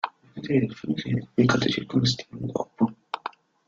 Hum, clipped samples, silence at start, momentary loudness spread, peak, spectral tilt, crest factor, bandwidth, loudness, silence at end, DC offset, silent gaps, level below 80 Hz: none; under 0.1%; 0.05 s; 13 LU; -8 dBFS; -6 dB/octave; 20 dB; 7.6 kHz; -26 LUFS; 0.4 s; under 0.1%; none; -58 dBFS